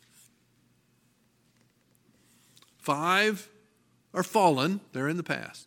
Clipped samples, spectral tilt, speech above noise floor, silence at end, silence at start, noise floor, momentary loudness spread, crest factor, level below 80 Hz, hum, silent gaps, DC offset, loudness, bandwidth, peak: under 0.1%; -4.5 dB/octave; 41 dB; 0.05 s; 2.85 s; -68 dBFS; 12 LU; 22 dB; -80 dBFS; none; none; under 0.1%; -28 LUFS; 17 kHz; -8 dBFS